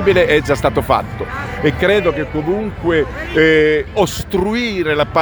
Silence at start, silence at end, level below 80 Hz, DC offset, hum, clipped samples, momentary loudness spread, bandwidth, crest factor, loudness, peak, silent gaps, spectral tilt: 0 s; 0 s; -32 dBFS; under 0.1%; none; under 0.1%; 7 LU; over 20 kHz; 14 dB; -15 LUFS; 0 dBFS; none; -5.5 dB/octave